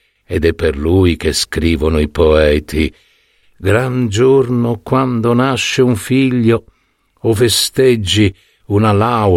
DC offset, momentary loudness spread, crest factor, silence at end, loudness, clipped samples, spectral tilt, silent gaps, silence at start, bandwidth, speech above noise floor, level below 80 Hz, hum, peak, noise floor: under 0.1%; 6 LU; 12 dB; 0 s; -14 LUFS; under 0.1%; -5.5 dB/octave; none; 0.3 s; 16.5 kHz; 46 dB; -28 dBFS; none; 0 dBFS; -59 dBFS